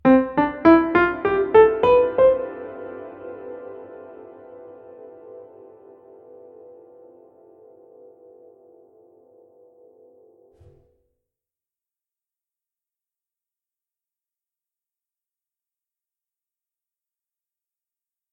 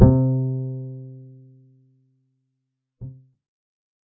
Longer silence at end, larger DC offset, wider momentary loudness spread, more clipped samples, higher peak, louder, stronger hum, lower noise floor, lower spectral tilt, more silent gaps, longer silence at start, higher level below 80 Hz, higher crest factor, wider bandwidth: first, 12.95 s vs 0.95 s; neither; first, 28 LU vs 23 LU; neither; about the same, -2 dBFS vs 0 dBFS; first, -17 LUFS vs -22 LUFS; neither; first, under -90 dBFS vs -79 dBFS; second, -8.5 dB/octave vs -15 dB/octave; neither; about the same, 0.05 s vs 0 s; second, -54 dBFS vs -36 dBFS; about the same, 24 dB vs 24 dB; first, 5 kHz vs 1.8 kHz